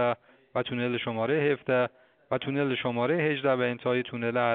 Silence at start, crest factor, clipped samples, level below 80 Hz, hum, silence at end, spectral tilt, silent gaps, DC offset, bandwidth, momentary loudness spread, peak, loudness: 0 s; 16 dB; under 0.1%; -70 dBFS; none; 0 s; -4.5 dB/octave; none; under 0.1%; 4.6 kHz; 7 LU; -12 dBFS; -28 LUFS